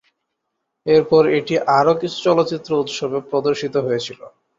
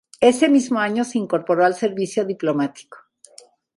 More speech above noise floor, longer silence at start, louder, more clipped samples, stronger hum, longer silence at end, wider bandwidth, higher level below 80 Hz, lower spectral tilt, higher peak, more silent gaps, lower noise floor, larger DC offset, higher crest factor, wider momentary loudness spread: first, 59 dB vs 31 dB; first, 0.85 s vs 0.2 s; about the same, -18 LUFS vs -20 LUFS; neither; neither; second, 0.3 s vs 0.85 s; second, 7.6 kHz vs 11.5 kHz; first, -58 dBFS vs -66 dBFS; about the same, -5.5 dB/octave vs -5 dB/octave; about the same, -2 dBFS vs -2 dBFS; neither; first, -76 dBFS vs -50 dBFS; neither; about the same, 16 dB vs 18 dB; about the same, 9 LU vs 7 LU